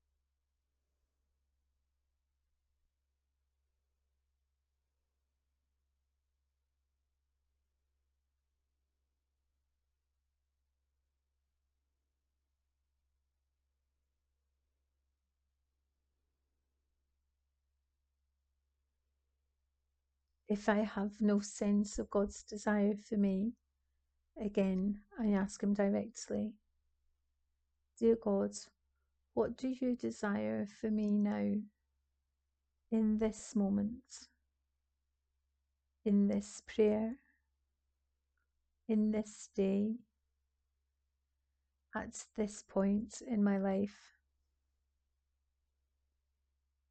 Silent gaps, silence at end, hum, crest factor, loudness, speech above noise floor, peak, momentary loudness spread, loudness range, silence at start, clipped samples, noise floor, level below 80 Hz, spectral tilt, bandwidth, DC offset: none; 3 s; none; 22 dB; -36 LUFS; 51 dB; -18 dBFS; 10 LU; 5 LU; 20.5 s; under 0.1%; -86 dBFS; -66 dBFS; -6.5 dB/octave; 8.8 kHz; under 0.1%